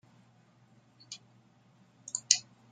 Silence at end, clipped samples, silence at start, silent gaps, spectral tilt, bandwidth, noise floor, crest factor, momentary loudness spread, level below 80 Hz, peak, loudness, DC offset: 0.3 s; under 0.1%; 1.1 s; none; 2 dB/octave; 12 kHz; -64 dBFS; 38 dB; 21 LU; -88 dBFS; -2 dBFS; -29 LUFS; under 0.1%